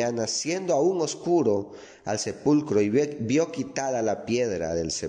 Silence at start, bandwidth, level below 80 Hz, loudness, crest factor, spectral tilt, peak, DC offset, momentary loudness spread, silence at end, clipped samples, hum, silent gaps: 0 s; 10.5 kHz; -58 dBFS; -25 LUFS; 14 dB; -4.5 dB/octave; -10 dBFS; under 0.1%; 7 LU; 0 s; under 0.1%; none; none